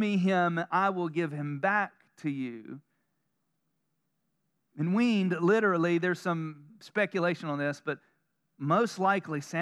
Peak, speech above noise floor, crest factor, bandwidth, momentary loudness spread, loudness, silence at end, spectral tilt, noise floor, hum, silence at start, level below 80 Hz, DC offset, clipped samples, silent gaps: -14 dBFS; 51 dB; 18 dB; 12.5 kHz; 12 LU; -29 LUFS; 0 s; -6.5 dB/octave; -80 dBFS; none; 0 s; under -90 dBFS; under 0.1%; under 0.1%; none